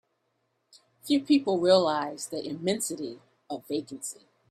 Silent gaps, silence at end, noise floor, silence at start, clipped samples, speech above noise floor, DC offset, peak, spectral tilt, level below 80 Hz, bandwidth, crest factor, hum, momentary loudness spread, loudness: none; 0.35 s; -76 dBFS; 1.05 s; under 0.1%; 49 dB; under 0.1%; -8 dBFS; -4 dB/octave; -72 dBFS; 14.5 kHz; 20 dB; none; 18 LU; -27 LUFS